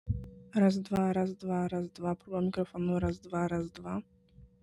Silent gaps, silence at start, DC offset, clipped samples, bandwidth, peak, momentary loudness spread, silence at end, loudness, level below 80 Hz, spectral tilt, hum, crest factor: none; 0.05 s; under 0.1%; under 0.1%; 11 kHz; -16 dBFS; 11 LU; 0.15 s; -33 LUFS; -54 dBFS; -8 dB/octave; none; 18 dB